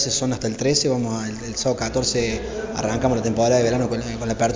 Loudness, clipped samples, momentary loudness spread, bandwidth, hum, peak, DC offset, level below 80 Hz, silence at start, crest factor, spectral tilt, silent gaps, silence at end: -22 LUFS; under 0.1%; 8 LU; 7.8 kHz; none; -6 dBFS; under 0.1%; -40 dBFS; 0 s; 14 dB; -4.5 dB/octave; none; 0 s